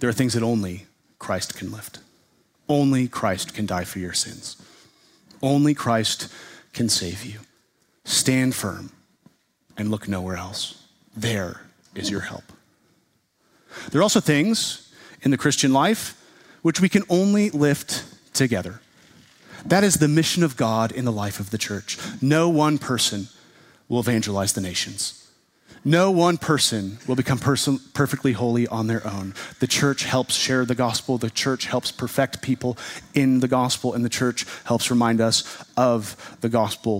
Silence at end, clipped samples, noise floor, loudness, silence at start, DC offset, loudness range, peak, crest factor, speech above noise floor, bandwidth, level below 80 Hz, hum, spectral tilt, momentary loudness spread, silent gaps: 0 s; under 0.1%; -66 dBFS; -22 LUFS; 0 s; under 0.1%; 5 LU; -2 dBFS; 20 dB; 44 dB; 16 kHz; -58 dBFS; none; -4.5 dB/octave; 15 LU; none